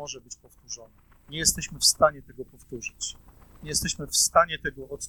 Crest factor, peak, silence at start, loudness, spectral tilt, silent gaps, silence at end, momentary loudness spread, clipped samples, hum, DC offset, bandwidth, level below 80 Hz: 24 dB; -4 dBFS; 0 s; -24 LUFS; -1.5 dB/octave; none; 0 s; 23 LU; under 0.1%; none; under 0.1%; 19 kHz; -50 dBFS